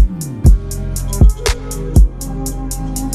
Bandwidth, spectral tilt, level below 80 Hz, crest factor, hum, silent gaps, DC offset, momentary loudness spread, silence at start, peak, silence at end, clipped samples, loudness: 14.5 kHz; -5.5 dB/octave; -14 dBFS; 12 dB; none; none; under 0.1%; 10 LU; 0 s; 0 dBFS; 0 s; under 0.1%; -16 LUFS